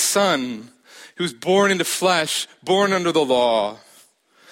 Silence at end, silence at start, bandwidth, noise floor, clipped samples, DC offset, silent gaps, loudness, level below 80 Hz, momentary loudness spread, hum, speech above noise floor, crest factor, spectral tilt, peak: 0.75 s; 0 s; 16.5 kHz; -54 dBFS; under 0.1%; under 0.1%; none; -19 LUFS; -66 dBFS; 10 LU; none; 35 dB; 16 dB; -3 dB/octave; -6 dBFS